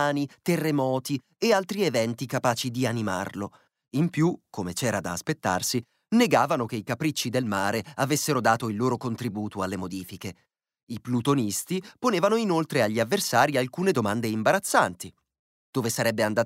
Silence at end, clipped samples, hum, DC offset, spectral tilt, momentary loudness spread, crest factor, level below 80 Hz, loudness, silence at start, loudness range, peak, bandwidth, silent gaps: 0 s; under 0.1%; none; under 0.1%; -4.5 dB/octave; 10 LU; 20 dB; -66 dBFS; -26 LUFS; 0 s; 4 LU; -6 dBFS; 16 kHz; 10.83-10.87 s, 15.39-15.73 s